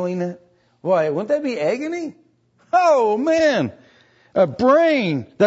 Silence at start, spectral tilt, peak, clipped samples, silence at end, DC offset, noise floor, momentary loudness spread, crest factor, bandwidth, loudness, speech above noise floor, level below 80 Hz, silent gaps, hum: 0 s; -6 dB/octave; -4 dBFS; under 0.1%; 0 s; under 0.1%; -59 dBFS; 13 LU; 16 dB; 8 kHz; -19 LUFS; 41 dB; -60 dBFS; none; none